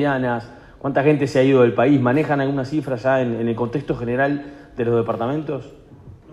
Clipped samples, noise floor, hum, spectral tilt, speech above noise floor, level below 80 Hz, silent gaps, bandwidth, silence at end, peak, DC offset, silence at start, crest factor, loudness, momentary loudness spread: under 0.1%; -43 dBFS; none; -8 dB/octave; 24 dB; -50 dBFS; none; 11 kHz; 0 s; -4 dBFS; under 0.1%; 0 s; 16 dB; -20 LUFS; 12 LU